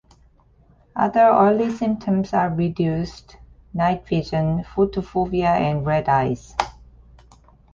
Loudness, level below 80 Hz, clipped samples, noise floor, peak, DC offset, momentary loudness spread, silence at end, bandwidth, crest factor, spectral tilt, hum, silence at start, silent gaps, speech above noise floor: -21 LUFS; -44 dBFS; under 0.1%; -55 dBFS; -2 dBFS; under 0.1%; 11 LU; 1.05 s; 7.6 kHz; 20 dB; -8 dB/octave; none; 0.95 s; none; 35 dB